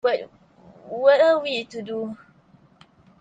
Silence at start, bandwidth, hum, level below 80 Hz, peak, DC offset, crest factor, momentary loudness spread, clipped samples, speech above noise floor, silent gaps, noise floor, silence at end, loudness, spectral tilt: 0.05 s; 8 kHz; none; -70 dBFS; -6 dBFS; under 0.1%; 18 dB; 20 LU; under 0.1%; 34 dB; none; -56 dBFS; 1.05 s; -21 LUFS; -4.5 dB/octave